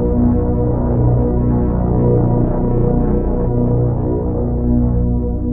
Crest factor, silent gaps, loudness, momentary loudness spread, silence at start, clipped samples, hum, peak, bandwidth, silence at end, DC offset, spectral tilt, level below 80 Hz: 12 dB; none; -16 LUFS; 4 LU; 0 s; under 0.1%; 60 Hz at -20 dBFS; -2 dBFS; 2.2 kHz; 0 s; under 0.1%; -15 dB/octave; -20 dBFS